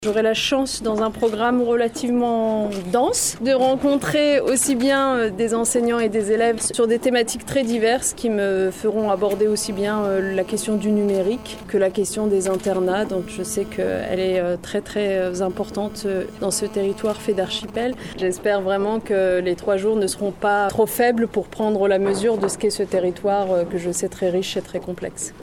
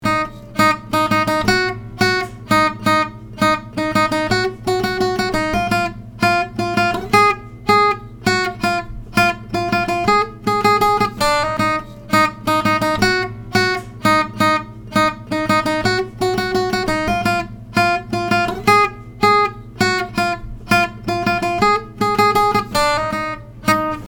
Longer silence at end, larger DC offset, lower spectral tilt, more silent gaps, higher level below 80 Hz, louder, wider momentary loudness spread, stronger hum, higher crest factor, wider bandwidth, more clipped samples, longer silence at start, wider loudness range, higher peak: about the same, 0 s vs 0 s; neither; about the same, -4 dB/octave vs -4.5 dB/octave; neither; second, -48 dBFS vs -40 dBFS; second, -21 LUFS vs -17 LUFS; about the same, 7 LU vs 7 LU; neither; about the same, 14 dB vs 18 dB; about the same, 18.5 kHz vs over 20 kHz; neither; about the same, 0 s vs 0 s; first, 4 LU vs 1 LU; second, -6 dBFS vs 0 dBFS